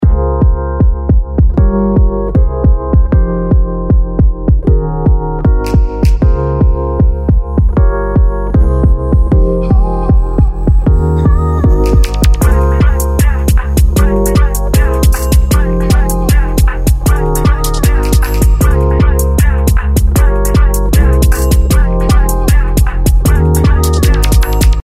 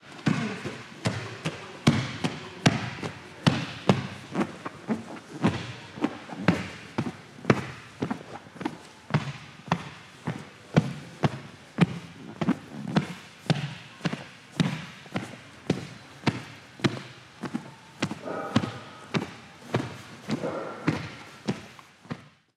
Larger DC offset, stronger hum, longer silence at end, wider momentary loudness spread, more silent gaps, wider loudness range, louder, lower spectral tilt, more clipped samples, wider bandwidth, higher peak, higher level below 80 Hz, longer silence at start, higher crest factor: neither; neither; second, 0.05 s vs 0.3 s; second, 3 LU vs 14 LU; neither; second, 1 LU vs 5 LU; first, -11 LUFS vs -31 LUFS; about the same, -6.5 dB/octave vs -6 dB/octave; neither; first, 16 kHz vs 13 kHz; about the same, 0 dBFS vs 0 dBFS; first, -10 dBFS vs -62 dBFS; about the same, 0 s vs 0.05 s; second, 8 dB vs 30 dB